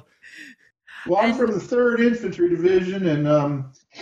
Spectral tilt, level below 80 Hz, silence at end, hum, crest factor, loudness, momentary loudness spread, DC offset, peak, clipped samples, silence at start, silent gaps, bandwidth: -7.5 dB/octave; -58 dBFS; 0 s; none; 16 dB; -21 LUFS; 17 LU; under 0.1%; -6 dBFS; under 0.1%; 0.35 s; none; 8 kHz